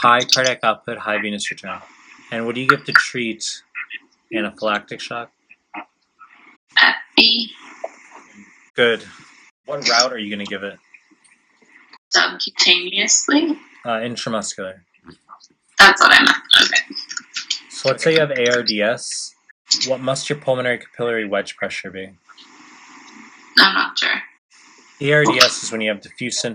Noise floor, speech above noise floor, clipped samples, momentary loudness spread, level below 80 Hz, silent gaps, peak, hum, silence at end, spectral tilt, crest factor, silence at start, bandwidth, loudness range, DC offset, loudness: -56 dBFS; 38 dB; under 0.1%; 19 LU; -62 dBFS; 6.56-6.67 s, 8.70-8.74 s, 9.51-9.64 s, 11.98-12.11 s, 19.51-19.65 s, 24.38-24.49 s; 0 dBFS; none; 0 s; -2 dB/octave; 20 dB; 0 s; 16 kHz; 8 LU; under 0.1%; -16 LUFS